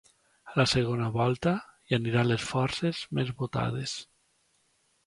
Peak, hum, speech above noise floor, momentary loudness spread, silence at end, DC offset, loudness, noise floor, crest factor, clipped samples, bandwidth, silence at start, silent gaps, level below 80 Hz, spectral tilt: -10 dBFS; none; 43 dB; 8 LU; 1.05 s; under 0.1%; -29 LUFS; -71 dBFS; 20 dB; under 0.1%; 11.5 kHz; 0.45 s; none; -56 dBFS; -5.5 dB/octave